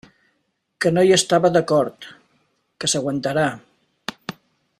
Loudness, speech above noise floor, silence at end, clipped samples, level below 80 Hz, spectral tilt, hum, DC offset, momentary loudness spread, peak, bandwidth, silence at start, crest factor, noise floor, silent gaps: -19 LUFS; 53 dB; 0.5 s; under 0.1%; -60 dBFS; -4 dB/octave; none; under 0.1%; 21 LU; -4 dBFS; 15 kHz; 0.8 s; 18 dB; -71 dBFS; none